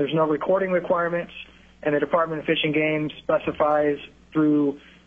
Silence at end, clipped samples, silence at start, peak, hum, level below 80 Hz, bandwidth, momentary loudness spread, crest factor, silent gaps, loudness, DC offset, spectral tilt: 0.3 s; under 0.1%; 0 s; -6 dBFS; none; -56 dBFS; 3.8 kHz; 9 LU; 16 dB; none; -23 LUFS; under 0.1%; -8 dB/octave